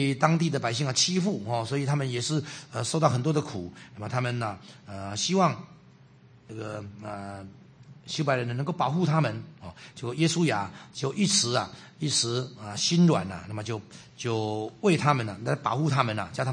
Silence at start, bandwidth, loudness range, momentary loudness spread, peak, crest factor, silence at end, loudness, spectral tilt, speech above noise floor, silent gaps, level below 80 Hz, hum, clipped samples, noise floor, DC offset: 0 s; 9.8 kHz; 6 LU; 16 LU; -4 dBFS; 24 dB; 0 s; -27 LUFS; -4.5 dB/octave; 27 dB; none; -66 dBFS; none; under 0.1%; -55 dBFS; under 0.1%